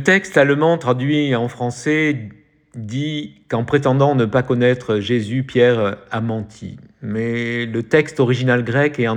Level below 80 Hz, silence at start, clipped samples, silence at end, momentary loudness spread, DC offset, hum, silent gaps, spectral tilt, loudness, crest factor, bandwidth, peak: -54 dBFS; 0 s; under 0.1%; 0 s; 12 LU; under 0.1%; none; none; -6.5 dB/octave; -18 LUFS; 16 dB; 10 kHz; 0 dBFS